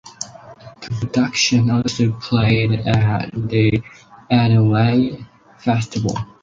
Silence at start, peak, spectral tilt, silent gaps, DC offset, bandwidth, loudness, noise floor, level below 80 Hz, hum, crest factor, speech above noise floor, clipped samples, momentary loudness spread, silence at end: 0.05 s; -2 dBFS; -6 dB/octave; none; under 0.1%; 7.6 kHz; -18 LUFS; -40 dBFS; -44 dBFS; none; 16 dB; 23 dB; under 0.1%; 13 LU; 0.2 s